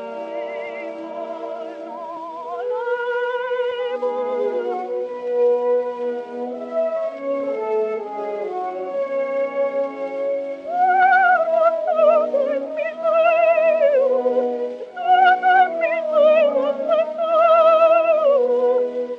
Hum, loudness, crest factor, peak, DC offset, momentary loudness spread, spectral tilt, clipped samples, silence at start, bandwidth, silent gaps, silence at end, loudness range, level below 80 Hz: none; -19 LUFS; 14 dB; -4 dBFS; under 0.1%; 15 LU; -4.5 dB/octave; under 0.1%; 0 s; 6.4 kHz; none; 0 s; 8 LU; -78 dBFS